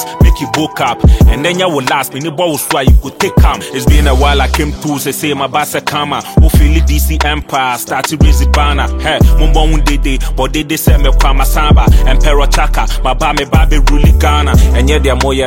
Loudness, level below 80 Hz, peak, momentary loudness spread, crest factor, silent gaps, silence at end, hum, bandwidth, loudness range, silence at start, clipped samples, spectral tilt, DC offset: -11 LUFS; -10 dBFS; 0 dBFS; 6 LU; 8 dB; none; 0 s; none; 17 kHz; 1 LU; 0 s; 0.1%; -5 dB/octave; under 0.1%